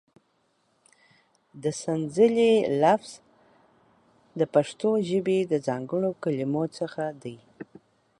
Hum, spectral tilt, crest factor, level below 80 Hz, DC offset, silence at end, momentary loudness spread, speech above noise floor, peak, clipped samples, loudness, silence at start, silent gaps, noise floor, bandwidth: none; -6 dB/octave; 20 dB; -70 dBFS; under 0.1%; 0.55 s; 21 LU; 45 dB; -8 dBFS; under 0.1%; -25 LUFS; 1.55 s; none; -70 dBFS; 11.5 kHz